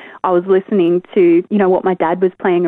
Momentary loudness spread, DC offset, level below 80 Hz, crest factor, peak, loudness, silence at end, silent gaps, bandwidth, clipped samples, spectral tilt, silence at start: 4 LU; under 0.1%; -60 dBFS; 12 dB; -2 dBFS; -14 LUFS; 0 s; none; 3.8 kHz; under 0.1%; -10.5 dB/octave; 0 s